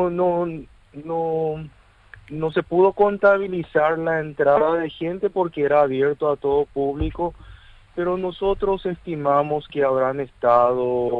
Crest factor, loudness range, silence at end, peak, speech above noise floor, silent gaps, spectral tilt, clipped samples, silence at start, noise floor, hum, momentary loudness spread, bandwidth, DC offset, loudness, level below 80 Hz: 18 dB; 4 LU; 0 s; -4 dBFS; 27 dB; none; -9 dB/octave; under 0.1%; 0 s; -48 dBFS; none; 11 LU; 4.9 kHz; under 0.1%; -21 LUFS; -44 dBFS